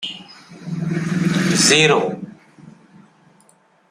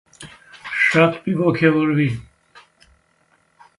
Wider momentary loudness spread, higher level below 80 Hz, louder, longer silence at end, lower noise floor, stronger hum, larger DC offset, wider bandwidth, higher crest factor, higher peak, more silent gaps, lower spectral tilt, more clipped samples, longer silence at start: about the same, 24 LU vs 23 LU; about the same, -58 dBFS vs -56 dBFS; about the same, -16 LUFS vs -18 LUFS; second, 1.2 s vs 1.55 s; second, -55 dBFS vs -61 dBFS; neither; neither; first, 15.5 kHz vs 11.5 kHz; about the same, 20 dB vs 20 dB; about the same, -2 dBFS vs -2 dBFS; neither; second, -3.5 dB/octave vs -7 dB/octave; neither; second, 0 s vs 0.2 s